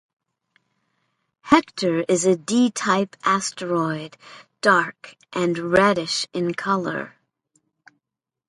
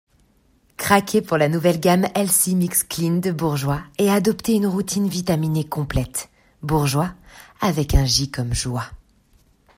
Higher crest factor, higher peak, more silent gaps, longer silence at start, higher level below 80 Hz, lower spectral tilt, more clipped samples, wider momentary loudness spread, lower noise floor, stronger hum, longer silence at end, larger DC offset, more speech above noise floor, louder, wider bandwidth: about the same, 22 dB vs 18 dB; about the same, 0 dBFS vs -2 dBFS; neither; first, 1.45 s vs 0.8 s; second, -60 dBFS vs -36 dBFS; about the same, -4 dB/octave vs -4.5 dB/octave; neither; first, 12 LU vs 9 LU; first, -85 dBFS vs -59 dBFS; neither; first, 1.4 s vs 0.8 s; neither; first, 64 dB vs 39 dB; about the same, -21 LUFS vs -20 LUFS; second, 11.5 kHz vs 16 kHz